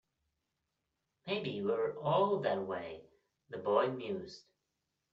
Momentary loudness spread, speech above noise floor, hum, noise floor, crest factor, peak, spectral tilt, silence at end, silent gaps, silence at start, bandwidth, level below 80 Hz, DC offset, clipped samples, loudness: 19 LU; 51 dB; none; -86 dBFS; 22 dB; -16 dBFS; -4.5 dB/octave; 0.75 s; none; 1.25 s; 7.4 kHz; -78 dBFS; under 0.1%; under 0.1%; -35 LUFS